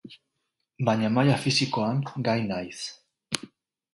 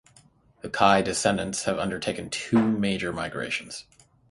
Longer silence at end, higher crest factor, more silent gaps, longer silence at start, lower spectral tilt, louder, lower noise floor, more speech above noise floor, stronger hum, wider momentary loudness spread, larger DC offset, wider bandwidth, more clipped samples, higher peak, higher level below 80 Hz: about the same, 0.5 s vs 0.5 s; about the same, 24 dB vs 22 dB; neither; second, 0.05 s vs 0.65 s; about the same, -5 dB/octave vs -4 dB/octave; about the same, -26 LUFS vs -25 LUFS; first, -80 dBFS vs -58 dBFS; first, 55 dB vs 33 dB; neither; about the same, 11 LU vs 13 LU; neither; about the same, 11.5 kHz vs 11.5 kHz; neither; about the same, -4 dBFS vs -4 dBFS; second, -64 dBFS vs -54 dBFS